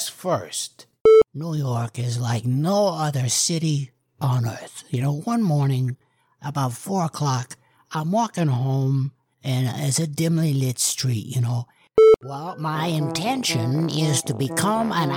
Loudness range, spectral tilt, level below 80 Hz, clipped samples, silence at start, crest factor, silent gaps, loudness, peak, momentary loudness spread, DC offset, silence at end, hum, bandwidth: 4 LU; -5 dB/octave; -58 dBFS; under 0.1%; 0 s; 16 dB; 1.01-1.05 s; -22 LUFS; -6 dBFS; 12 LU; under 0.1%; 0 s; none; 17.5 kHz